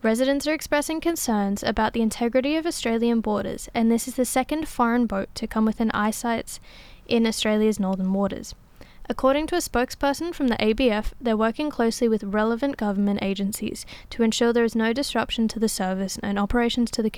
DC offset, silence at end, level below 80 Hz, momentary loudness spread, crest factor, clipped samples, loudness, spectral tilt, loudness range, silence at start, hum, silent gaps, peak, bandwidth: under 0.1%; 0 s; -44 dBFS; 6 LU; 16 dB; under 0.1%; -24 LUFS; -4.5 dB/octave; 1 LU; 0.05 s; none; none; -8 dBFS; 16 kHz